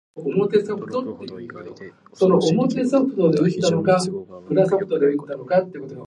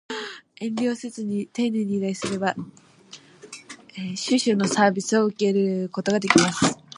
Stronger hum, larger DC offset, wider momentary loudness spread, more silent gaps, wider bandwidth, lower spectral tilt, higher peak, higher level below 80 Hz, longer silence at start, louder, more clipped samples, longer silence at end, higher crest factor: neither; neither; second, 16 LU vs 21 LU; neither; about the same, 11.5 kHz vs 11.5 kHz; first, -6.5 dB/octave vs -4.5 dB/octave; second, -4 dBFS vs 0 dBFS; about the same, -64 dBFS vs -64 dBFS; about the same, 0.15 s vs 0.1 s; first, -20 LUFS vs -23 LUFS; neither; second, 0 s vs 0.25 s; second, 18 dB vs 24 dB